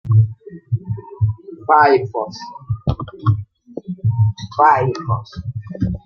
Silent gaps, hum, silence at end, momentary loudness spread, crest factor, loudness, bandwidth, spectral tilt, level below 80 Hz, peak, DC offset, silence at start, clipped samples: none; none; 0.1 s; 16 LU; 18 dB; -18 LUFS; 6.4 kHz; -8 dB/octave; -42 dBFS; 0 dBFS; under 0.1%; 0.05 s; under 0.1%